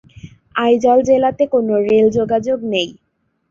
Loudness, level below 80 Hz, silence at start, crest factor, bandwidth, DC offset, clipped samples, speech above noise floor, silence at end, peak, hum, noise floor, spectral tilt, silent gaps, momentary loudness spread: -15 LUFS; -50 dBFS; 0.25 s; 14 dB; 7.6 kHz; under 0.1%; under 0.1%; 25 dB; 0.6 s; -2 dBFS; none; -39 dBFS; -5.5 dB/octave; none; 8 LU